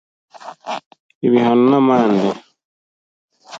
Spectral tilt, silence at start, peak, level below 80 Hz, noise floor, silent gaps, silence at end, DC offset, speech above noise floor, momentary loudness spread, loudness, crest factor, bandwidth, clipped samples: -7.5 dB/octave; 0.45 s; -2 dBFS; -68 dBFS; under -90 dBFS; 0.86-0.91 s, 1.00-1.09 s, 1.15-1.21 s, 2.65-3.28 s; 0 s; under 0.1%; over 77 dB; 19 LU; -15 LUFS; 16 dB; 7.6 kHz; under 0.1%